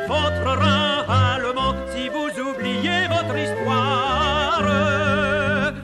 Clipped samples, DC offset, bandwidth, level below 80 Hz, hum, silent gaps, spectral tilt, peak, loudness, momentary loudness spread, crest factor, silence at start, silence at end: under 0.1%; under 0.1%; 12 kHz; -38 dBFS; none; none; -5.5 dB/octave; -6 dBFS; -20 LUFS; 6 LU; 14 dB; 0 s; 0 s